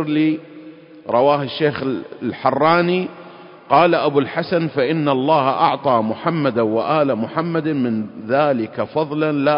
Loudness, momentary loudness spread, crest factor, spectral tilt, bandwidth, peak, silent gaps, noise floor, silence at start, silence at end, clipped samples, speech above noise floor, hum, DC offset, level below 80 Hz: -18 LUFS; 8 LU; 18 dB; -11.5 dB/octave; 5.4 kHz; 0 dBFS; none; -40 dBFS; 0 s; 0 s; under 0.1%; 22 dB; none; under 0.1%; -60 dBFS